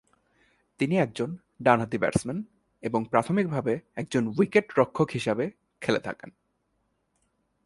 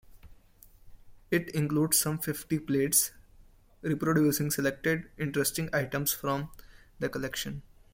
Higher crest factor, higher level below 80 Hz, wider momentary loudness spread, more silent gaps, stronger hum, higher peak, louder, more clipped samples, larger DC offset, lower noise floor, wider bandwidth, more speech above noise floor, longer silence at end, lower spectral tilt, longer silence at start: about the same, 24 dB vs 20 dB; about the same, -60 dBFS vs -56 dBFS; about the same, 11 LU vs 11 LU; neither; neither; first, -4 dBFS vs -10 dBFS; about the same, -27 LUFS vs -29 LUFS; neither; neither; first, -74 dBFS vs -57 dBFS; second, 11.5 kHz vs 16.5 kHz; first, 48 dB vs 28 dB; first, 1.35 s vs 0.3 s; first, -6.5 dB/octave vs -4 dB/octave; first, 0.8 s vs 0.15 s